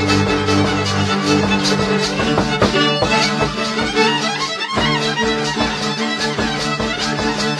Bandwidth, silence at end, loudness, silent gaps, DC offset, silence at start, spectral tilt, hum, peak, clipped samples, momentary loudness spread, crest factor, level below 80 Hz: 13 kHz; 0 s; -16 LUFS; none; under 0.1%; 0 s; -4 dB/octave; none; 0 dBFS; under 0.1%; 4 LU; 16 dB; -38 dBFS